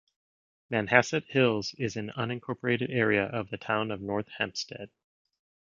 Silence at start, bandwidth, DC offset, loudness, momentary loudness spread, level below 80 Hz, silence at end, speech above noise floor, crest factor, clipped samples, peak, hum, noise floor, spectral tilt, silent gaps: 0.7 s; 7.6 kHz; under 0.1%; -29 LUFS; 11 LU; -64 dBFS; 0.9 s; over 61 dB; 28 dB; under 0.1%; -4 dBFS; none; under -90 dBFS; -5 dB/octave; none